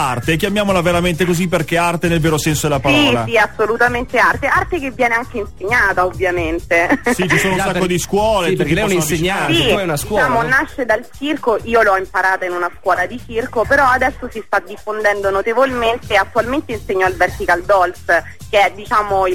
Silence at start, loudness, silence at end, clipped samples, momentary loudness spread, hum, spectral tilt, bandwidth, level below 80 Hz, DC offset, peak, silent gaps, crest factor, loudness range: 0 s; -15 LUFS; 0 s; under 0.1%; 6 LU; none; -4.5 dB/octave; 17 kHz; -36 dBFS; 1%; -4 dBFS; none; 12 dB; 2 LU